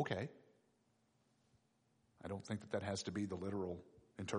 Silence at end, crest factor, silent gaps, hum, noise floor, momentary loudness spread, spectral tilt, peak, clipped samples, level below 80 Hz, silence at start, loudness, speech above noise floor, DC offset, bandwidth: 0 s; 20 dB; none; none; -78 dBFS; 10 LU; -5.5 dB/octave; -26 dBFS; under 0.1%; -74 dBFS; 0 s; -45 LUFS; 35 dB; under 0.1%; 10.5 kHz